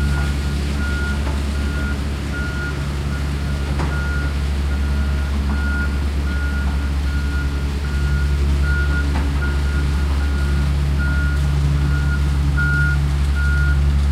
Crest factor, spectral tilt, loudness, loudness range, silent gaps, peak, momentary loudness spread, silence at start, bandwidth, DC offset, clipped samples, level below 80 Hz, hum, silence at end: 12 dB; -6.5 dB/octave; -20 LUFS; 4 LU; none; -6 dBFS; 5 LU; 0 s; 11.5 kHz; under 0.1%; under 0.1%; -20 dBFS; none; 0 s